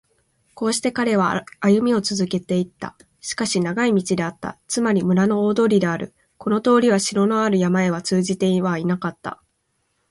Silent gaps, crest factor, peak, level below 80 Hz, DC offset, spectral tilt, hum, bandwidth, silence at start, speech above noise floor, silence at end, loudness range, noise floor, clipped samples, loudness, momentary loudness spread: none; 16 dB; -4 dBFS; -60 dBFS; under 0.1%; -5.5 dB/octave; none; 11.5 kHz; 0.55 s; 51 dB; 0.75 s; 3 LU; -70 dBFS; under 0.1%; -20 LUFS; 12 LU